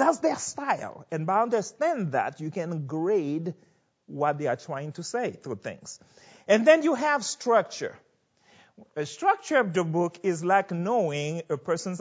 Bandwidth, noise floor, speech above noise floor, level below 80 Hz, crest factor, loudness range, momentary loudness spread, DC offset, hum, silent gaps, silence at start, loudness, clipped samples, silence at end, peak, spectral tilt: 8 kHz; -64 dBFS; 37 dB; -74 dBFS; 22 dB; 5 LU; 13 LU; under 0.1%; none; none; 0 s; -27 LUFS; under 0.1%; 0 s; -4 dBFS; -5 dB/octave